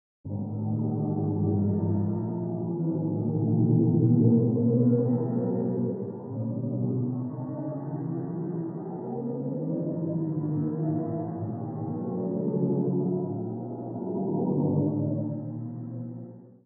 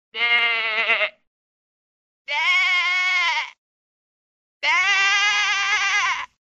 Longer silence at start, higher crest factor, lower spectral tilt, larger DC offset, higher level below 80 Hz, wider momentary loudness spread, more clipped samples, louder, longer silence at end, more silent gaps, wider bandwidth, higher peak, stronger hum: about the same, 0.25 s vs 0.15 s; about the same, 18 dB vs 18 dB; first, -13 dB/octave vs 2.5 dB/octave; neither; about the same, -70 dBFS vs -70 dBFS; first, 12 LU vs 8 LU; neither; second, -28 LUFS vs -18 LUFS; about the same, 0.15 s vs 0.2 s; second, none vs 1.27-2.25 s, 3.58-4.60 s; second, 2 kHz vs 8.2 kHz; second, -10 dBFS vs -6 dBFS; neither